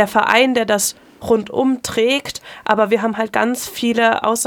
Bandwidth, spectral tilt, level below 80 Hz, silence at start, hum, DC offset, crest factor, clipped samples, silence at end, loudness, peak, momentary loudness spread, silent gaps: 19.5 kHz; -3 dB/octave; -56 dBFS; 0 s; none; under 0.1%; 16 dB; under 0.1%; 0 s; -17 LUFS; 0 dBFS; 7 LU; none